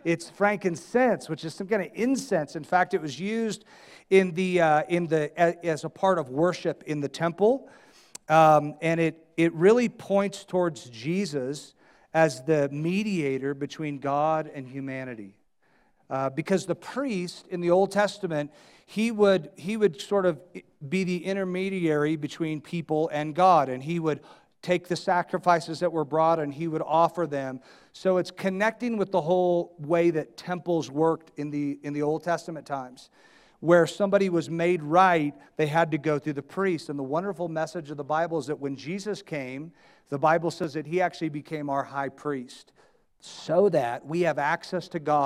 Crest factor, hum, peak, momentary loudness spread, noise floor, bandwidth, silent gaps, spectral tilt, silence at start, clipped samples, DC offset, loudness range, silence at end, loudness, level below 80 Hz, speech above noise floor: 20 dB; none; -6 dBFS; 12 LU; -65 dBFS; 14 kHz; none; -6 dB/octave; 0.05 s; under 0.1%; under 0.1%; 6 LU; 0 s; -26 LUFS; -68 dBFS; 39 dB